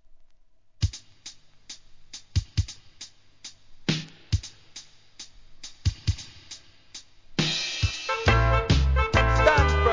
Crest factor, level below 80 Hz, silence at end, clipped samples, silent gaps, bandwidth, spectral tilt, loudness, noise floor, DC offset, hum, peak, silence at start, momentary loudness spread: 22 dB; -32 dBFS; 0 s; under 0.1%; none; 7.6 kHz; -5 dB/octave; -25 LUFS; -59 dBFS; 0.2%; none; -6 dBFS; 0.8 s; 24 LU